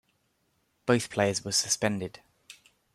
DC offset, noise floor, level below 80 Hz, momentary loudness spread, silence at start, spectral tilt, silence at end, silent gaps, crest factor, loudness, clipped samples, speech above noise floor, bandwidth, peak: under 0.1%; -73 dBFS; -68 dBFS; 11 LU; 0.85 s; -3.5 dB/octave; 0.4 s; none; 20 dB; -28 LUFS; under 0.1%; 45 dB; 15 kHz; -10 dBFS